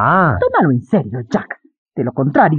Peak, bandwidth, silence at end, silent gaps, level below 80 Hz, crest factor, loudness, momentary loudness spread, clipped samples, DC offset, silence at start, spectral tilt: -2 dBFS; 7.4 kHz; 0 s; 1.78-1.86 s; -48 dBFS; 14 dB; -16 LUFS; 16 LU; under 0.1%; under 0.1%; 0 s; -9 dB/octave